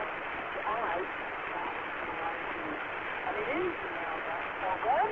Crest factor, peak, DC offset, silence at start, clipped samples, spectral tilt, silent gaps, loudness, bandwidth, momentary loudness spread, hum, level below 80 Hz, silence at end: 16 dB; -18 dBFS; under 0.1%; 0 s; under 0.1%; -1.5 dB/octave; none; -34 LUFS; 7.2 kHz; 4 LU; none; -62 dBFS; 0 s